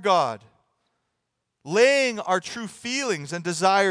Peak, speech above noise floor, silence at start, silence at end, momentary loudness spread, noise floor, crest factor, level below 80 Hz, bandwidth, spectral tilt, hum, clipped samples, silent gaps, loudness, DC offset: -6 dBFS; 57 dB; 0 s; 0 s; 12 LU; -79 dBFS; 18 dB; -76 dBFS; 10.5 kHz; -3.5 dB/octave; none; under 0.1%; none; -23 LUFS; under 0.1%